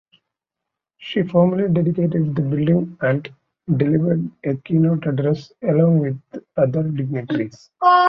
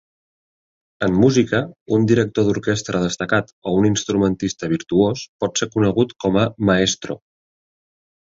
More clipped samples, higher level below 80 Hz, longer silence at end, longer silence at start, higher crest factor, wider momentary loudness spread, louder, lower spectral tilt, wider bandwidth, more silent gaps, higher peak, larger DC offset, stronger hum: neither; second, -58 dBFS vs -46 dBFS; second, 0 s vs 1.15 s; about the same, 1 s vs 1 s; about the same, 16 dB vs 18 dB; about the same, 9 LU vs 7 LU; about the same, -20 LUFS vs -19 LUFS; first, -9.5 dB/octave vs -5.5 dB/octave; second, 6 kHz vs 7.8 kHz; second, none vs 1.81-1.86 s, 3.53-3.62 s, 5.28-5.39 s; about the same, -2 dBFS vs -2 dBFS; neither; neither